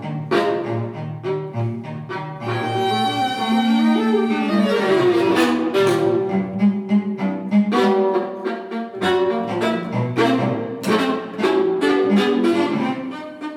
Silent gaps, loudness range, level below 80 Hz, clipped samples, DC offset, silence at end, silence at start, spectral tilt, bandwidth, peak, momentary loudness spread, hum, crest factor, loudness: none; 3 LU; -64 dBFS; under 0.1%; under 0.1%; 0 s; 0 s; -6.5 dB/octave; 14.5 kHz; -4 dBFS; 10 LU; none; 14 dB; -20 LUFS